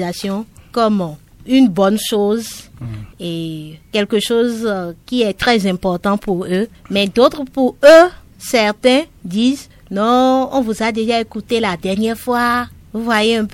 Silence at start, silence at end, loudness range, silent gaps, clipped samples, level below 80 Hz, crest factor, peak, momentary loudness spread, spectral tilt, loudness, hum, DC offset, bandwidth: 0 s; 0 s; 5 LU; none; under 0.1%; -46 dBFS; 16 dB; 0 dBFS; 13 LU; -5 dB/octave; -15 LUFS; none; under 0.1%; 17 kHz